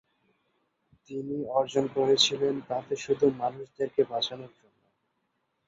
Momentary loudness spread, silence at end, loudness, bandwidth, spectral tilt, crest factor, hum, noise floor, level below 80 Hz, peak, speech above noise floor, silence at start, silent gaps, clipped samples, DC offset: 12 LU; 1.2 s; -28 LUFS; 7.8 kHz; -4 dB/octave; 22 dB; none; -77 dBFS; -70 dBFS; -8 dBFS; 49 dB; 1.1 s; none; under 0.1%; under 0.1%